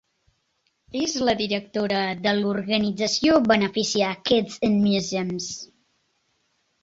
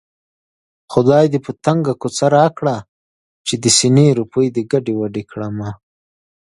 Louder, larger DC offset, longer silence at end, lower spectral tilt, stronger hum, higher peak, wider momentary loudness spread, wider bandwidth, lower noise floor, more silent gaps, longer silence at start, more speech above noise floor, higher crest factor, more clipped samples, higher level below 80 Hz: second, -23 LUFS vs -16 LUFS; neither; first, 1.2 s vs 0.8 s; about the same, -4 dB/octave vs -5 dB/octave; neither; second, -6 dBFS vs 0 dBFS; second, 10 LU vs 13 LU; second, 8 kHz vs 11.5 kHz; second, -71 dBFS vs under -90 dBFS; second, none vs 2.88-3.45 s; about the same, 0.95 s vs 0.9 s; second, 49 dB vs over 75 dB; about the same, 18 dB vs 16 dB; neither; about the same, -58 dBFS vs -54 dBFS